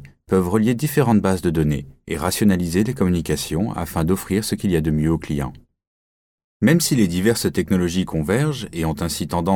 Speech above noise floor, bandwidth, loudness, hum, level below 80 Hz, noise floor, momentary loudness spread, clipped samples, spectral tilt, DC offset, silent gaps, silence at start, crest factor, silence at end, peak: over 71 dB; 19.5 kHz; -20 LUFS; none; -38 dBFS; under -90 dBFS; 7 LU; under 0.1%; -6 dB/octave; under 0.1%; 5.87-6.38 s, 6.44-6.60 s; 0 s; 16 dB; 0 s; -4 dBFS